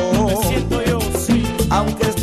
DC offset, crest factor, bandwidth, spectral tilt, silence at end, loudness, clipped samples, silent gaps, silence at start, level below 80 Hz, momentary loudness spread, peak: under 0.1%; 10 dB; 14.5 kHz; -5.5 dB/octave; 0 s; -18 LUFS; under 0.1%; none; 0 s; -28 dBFS; 2 LU; -6 dBFS